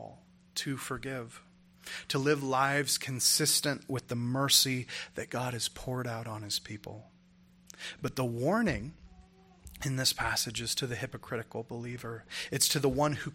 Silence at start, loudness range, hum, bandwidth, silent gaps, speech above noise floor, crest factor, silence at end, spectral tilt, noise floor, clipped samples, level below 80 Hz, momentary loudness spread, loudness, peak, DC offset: 0 s; 8 LU; none; 16.5 kHz; none; 29 dB; 22 dB; 0 s; -3 dB/octave; -61 dBFS; under 0.1%; -58 dBFS; 17 LU; -31 LUFS; -10 dBFS; under 0.1%